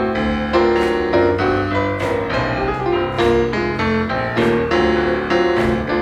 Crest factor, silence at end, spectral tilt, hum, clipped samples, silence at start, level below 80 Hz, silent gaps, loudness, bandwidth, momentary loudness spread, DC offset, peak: 14 dB; 0 s; -6.5 dB/octave; none; under 0.1%; 0 s; -34 dBFS; none; -17 LUFS; 10.5 kHz; 4 LU; under 0.1%; -2 dBFS